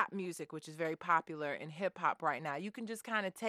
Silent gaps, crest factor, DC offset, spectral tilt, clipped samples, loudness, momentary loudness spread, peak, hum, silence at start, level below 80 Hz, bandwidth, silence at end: none; 22 dB; under 0.1%; -4.5 dB/octave; under 0.1%; -38 LUFS; 9 LU; -16 dBFS; none; 0 s; -88 dBFS; 15 kHz; 0 s